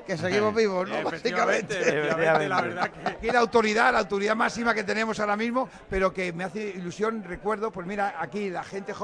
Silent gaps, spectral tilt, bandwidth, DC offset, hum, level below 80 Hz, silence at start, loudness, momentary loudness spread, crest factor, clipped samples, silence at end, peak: none; -4.5 dB/octave; 10.5 kHz; under 0.1%; none; -52 dBFS; 0 s; -26 LUFS; 10 LU; 20 dB; under 0.1%; 0 s; -6 dBFS